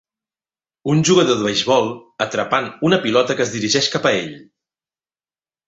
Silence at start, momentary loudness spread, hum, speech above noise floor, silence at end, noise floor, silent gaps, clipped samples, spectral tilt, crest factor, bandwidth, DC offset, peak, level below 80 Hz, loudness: 0.85 s; 9 LU; none; over 73 dB; 1.25 s; under -90 dBFS; none; under 0.1%; -4 dB/octave; 18 dB; 8.2 kHz; under 0.1%; 0 dBFS; -58 dBFS; -17 LUFS